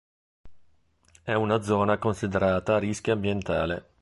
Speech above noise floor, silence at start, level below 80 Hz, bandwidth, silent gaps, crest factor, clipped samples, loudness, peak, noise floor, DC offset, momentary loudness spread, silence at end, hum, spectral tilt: 38 dB; 0.45 s; -48 dBFS; 11.5 kHz; none; 18 dB; under 0.1%; -26 LUFS; -8 dBFS; -63 dBFS; under 0.1%; 5 LU; 0.2 s; none; -6.5 dB/octave